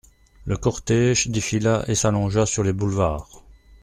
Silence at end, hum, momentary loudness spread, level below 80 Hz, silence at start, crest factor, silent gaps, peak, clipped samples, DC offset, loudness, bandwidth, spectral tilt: 0.45 s; none; 6 LU; -40 dBFS; 0.45 s; 16 dB; none; -6 dBFS; under 0.1%; under 0.1%; -21 LUFS; 13 kHz; -5 dB/octave